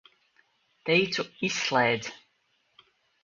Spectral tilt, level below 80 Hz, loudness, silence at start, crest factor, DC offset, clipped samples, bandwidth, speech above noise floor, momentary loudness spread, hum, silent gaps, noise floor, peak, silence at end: -3.5 dB/octave; -70 dBFS; -26 LUFS; 0.85 s; 22 dB; under 0.1%; under 0.1%; 7.6 kHz; 45 dB; 11 LU; none; none; -72 dBFS; -10 dBFS; 1.05 s